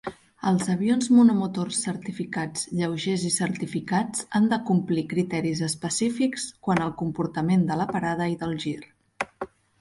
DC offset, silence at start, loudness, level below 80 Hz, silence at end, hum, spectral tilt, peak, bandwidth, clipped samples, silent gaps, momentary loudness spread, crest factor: under 0.1%; 0.05 s; -25 LUFS; -60 dBFS; 0.35 s; none; -5 dB/octave; -8 dBFS; 11.5 kHz; under 0.1%; none; 10 LU; 18 dB